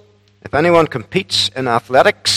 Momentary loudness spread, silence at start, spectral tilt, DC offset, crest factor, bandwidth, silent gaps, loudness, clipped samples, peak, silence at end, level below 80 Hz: 7 LU; 0.45 s; -3.5 dB/octave; under 0.1%; 16 dB; 16 kHz; none; -15 LUFS; 0.2%; 0 dBFS; 0 s; -50 dBFS